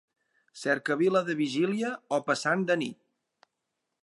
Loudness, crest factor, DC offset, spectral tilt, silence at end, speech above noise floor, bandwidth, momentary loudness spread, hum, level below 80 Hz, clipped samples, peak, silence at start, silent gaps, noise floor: -28 LUFS; 18 dB; under 0.1%; -5 dB/octave; 1.1 s; 56 dB; 11.5 kHz; 6 LU; none; -82 dBFS; under 0.1%; -12 dBFS; 0.55 s; none; -83 dBFS